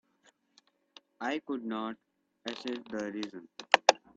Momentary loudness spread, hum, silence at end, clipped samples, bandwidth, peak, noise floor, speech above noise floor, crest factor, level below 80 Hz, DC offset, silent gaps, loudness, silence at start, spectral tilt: 18 LU; none; 0.2 s; under 0.1%; 9 kHz; 0 dBFS; -69 dBFS; 32 dB; 34 dB; -80 dBFS; under 0.1%; none; -32 LUFS; 1.2 s; -2 dB/octave